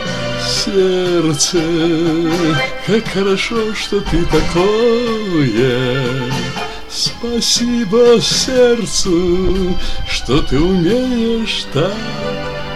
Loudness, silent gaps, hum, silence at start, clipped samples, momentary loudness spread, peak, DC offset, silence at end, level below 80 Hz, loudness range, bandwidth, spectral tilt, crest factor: -15 LUFS; none; none; 0 s; under 0.1%; 8 LU; -2 dBFS; 3%; 0 s; -28 dBFS; 2 LU; 15 kHz; -4.5 dB/octave; 12 dB